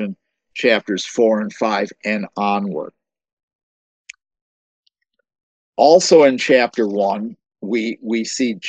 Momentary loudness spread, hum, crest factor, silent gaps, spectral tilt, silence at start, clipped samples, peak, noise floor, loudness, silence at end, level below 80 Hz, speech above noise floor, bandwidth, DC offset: 17 LU; none; 18 dB; 3.33-3.37 s, 3.43-3.48 s, 3.55-4.05 s, 4.41-4.83 s, 5.43-5.73 s; -4 dB/octave; 0 s; under 0.1%; 0 dBFS; -67 dBFS; -17 LUFS; 0 s; -70 dBFS; 51 dB; 9 kHz; under 0.1%